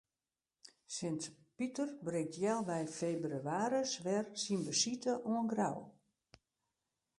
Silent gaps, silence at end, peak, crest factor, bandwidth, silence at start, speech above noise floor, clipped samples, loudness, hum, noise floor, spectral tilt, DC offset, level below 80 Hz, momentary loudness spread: none; 1.3 s; -20 dBFS; 20 dB; 11.5 kHz; 0.9 s; over 52 dB; under 0.1%; -38 LUFS; none; under -90 dBFS; -4 dB/octave; under 0.1%; -80 dBFS; 8 LU